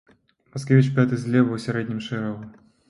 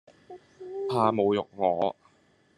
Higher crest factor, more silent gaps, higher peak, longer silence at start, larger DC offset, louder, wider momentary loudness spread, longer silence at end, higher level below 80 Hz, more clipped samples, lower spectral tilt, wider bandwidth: about the same, 18 dB vs 20 dB; neither; first, -4 dBFS vs -8 dBFS; first, 0.55 s vs 0.3 s; neither; first, -22 LUFS vs -27 LUFS; about the same, 16 LU vs 14 LU; second, 0.4 s vs 0.65 s; first, -62 dBFS vs -74 dBFS; neither; about the same, -7.5 dB/octave vs -7.5 dB/octave; first, 11.5 kHz vs 10 kHz